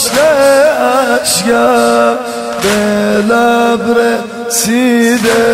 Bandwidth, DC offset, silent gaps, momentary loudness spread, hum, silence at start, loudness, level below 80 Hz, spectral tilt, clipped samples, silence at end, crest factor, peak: 16.5 kHz; under 0.1%; none; 6 LU; none; 0 s; -10 LUFS; -44 dBFS; -3 dB/octave; under 0.1%; 0 s; 10 dB; 0 dBFS